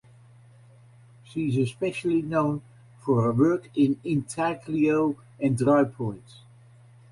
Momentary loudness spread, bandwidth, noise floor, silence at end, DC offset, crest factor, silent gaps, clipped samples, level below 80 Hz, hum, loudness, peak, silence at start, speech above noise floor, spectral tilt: 12 LU; 11.5 kHz; -53 dBFS; 0.9 s; under 0.1%; 18 dB; none; under 0.1%; -60 dBFS; none; -25 LUFS; -8 dBFS; 1.3 s; 28 dB; -7.5 dB/octave